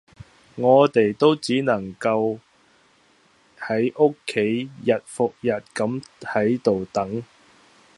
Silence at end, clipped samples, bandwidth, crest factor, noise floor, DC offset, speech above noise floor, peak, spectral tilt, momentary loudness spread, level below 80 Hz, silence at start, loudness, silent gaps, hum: 0.75 s; under 0.1%; 11.5 kHz; 20 dB; -58 dBFS; under 0.1%; 37 dB; -2 dBFS; -6 dB/octave; 10 LU; -62 dBFS; 0.55 s; -22 LUFS; none; none